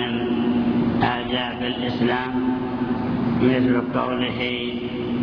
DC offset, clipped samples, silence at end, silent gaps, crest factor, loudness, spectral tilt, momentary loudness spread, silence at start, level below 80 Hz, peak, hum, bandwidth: under 0.1%; under 0.1%; 0 s; none; 16 dB; -22 LUFS; -8.5 dB/octave; 5 LU; 0 s; -46 dBFS; -6 dBFS; none; 5.4 kHz